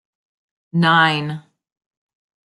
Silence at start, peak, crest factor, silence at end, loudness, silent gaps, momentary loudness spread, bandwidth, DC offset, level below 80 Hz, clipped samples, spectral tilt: 0.75 s; -2 dBFS; 20 dB; 1.05 s; -16 LUFS; none; 16 LU; 11.5 kHz; under 0.1%; -66 dBFS; under 0.1%; -6 dB/octave